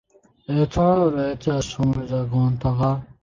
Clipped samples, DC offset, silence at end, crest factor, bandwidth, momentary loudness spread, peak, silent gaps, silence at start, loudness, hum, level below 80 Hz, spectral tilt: under 0.1%; under 0.1%; 0.2 s; 14 dB; 7.6 kHz; 6 LU; -6 dBFS; none; 0.5 s; -22 LUFS; none; -42 dBFS; -7.5 dB/octave